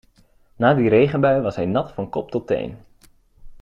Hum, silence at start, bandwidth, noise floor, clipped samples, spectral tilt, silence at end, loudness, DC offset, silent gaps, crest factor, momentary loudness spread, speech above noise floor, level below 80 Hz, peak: none; 0.6 s; 7.2 kHz; -56 dBFS; under 0.1%; -8.5 dB/octave; 0.05 s; -20 LUFS; under 0.1%; none; 18 dB; 11 LU; 36 dB; -50 dBFS; -4 dBFS